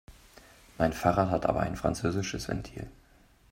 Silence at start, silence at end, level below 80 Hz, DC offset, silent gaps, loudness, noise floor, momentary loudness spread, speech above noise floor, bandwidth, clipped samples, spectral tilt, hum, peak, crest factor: 0.1 s; 0.6 s; -48 dBFS; under 0.1%; none; -30 LUFS; -60 dBFS; 15 LU; 31 dB; 16 kHz; under 0.1%; -6 dB/octave; none; -10 dBFS; 22 dB